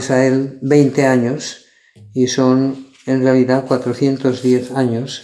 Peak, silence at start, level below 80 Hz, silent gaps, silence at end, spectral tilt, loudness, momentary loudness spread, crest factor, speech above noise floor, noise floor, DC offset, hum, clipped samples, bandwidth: 0 dBFS; 0 s; -62 dBFS; none; 0 s; -6 dB/octave; -15 LUFS; 8 LU; 14 dB; 29 dB; -44 dBFS; under 0.1%; none; under 0.1%; 11 kHz